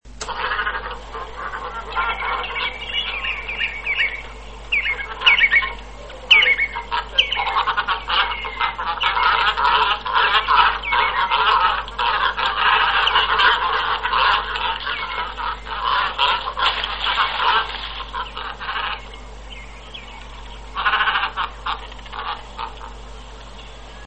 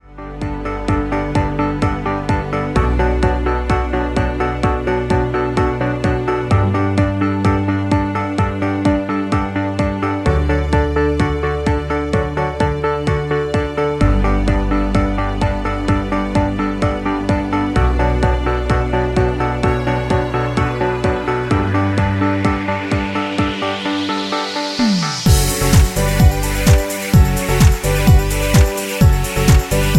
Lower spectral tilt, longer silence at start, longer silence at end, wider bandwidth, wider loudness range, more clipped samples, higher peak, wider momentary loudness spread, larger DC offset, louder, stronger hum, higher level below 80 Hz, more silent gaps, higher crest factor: second, -2 dB/octave vs -6 dB/octave; about the same, 0.05 s vs 0.05 s; about the same, 0 s vs 0 s; second, 8.6 kHz vs 16.5 kHz; first, 8 LU vs 4 LU; neither; about the same, -2 dBFS vs 0 dBFS; first, 21 LU vs 5 LU; first, 0.4% vs under 0.1%; about the same, -19 LUFS vs -17 LUFS; neither; second, -38 dBFS vs -22 dBFS; neither; about the same, 20 dB vs 16 dB